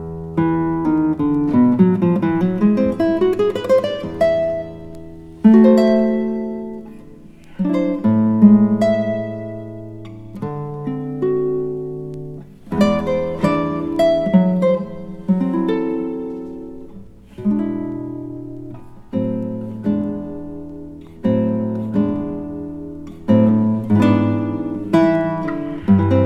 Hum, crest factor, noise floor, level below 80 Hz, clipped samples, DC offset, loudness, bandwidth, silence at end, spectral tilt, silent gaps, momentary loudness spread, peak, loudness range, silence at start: none; 18 dB; -40 dBFS; -46 dBFS; under 0.1%; under 0.1%; -18 LUFS; 8.2 kHz; 0 s; -9 dB/octave; none; 18 LU; 0 dBFS; 9 LU; 0 s